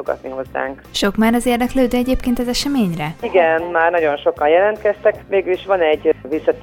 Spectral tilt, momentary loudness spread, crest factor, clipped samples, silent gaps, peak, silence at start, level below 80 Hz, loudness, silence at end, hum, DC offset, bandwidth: -5 dB/octave; 9 LU; 16 dB; under 0.1%; none; -2 dBFS; 0 s; -36 dBFS; -17 LUFS; 0 s; none; under 0.1%; 18.5 kHz